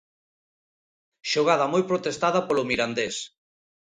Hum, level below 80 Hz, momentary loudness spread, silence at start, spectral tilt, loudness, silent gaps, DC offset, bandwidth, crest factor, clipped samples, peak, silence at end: none; -64 dBFS; 11 LU; 1.25 s; -4 dB/octave; -24 LUFS; none; under 0.1%; 10.5 kHz; 20 dB; under 0.1%; -8 dBFS; 0.7 s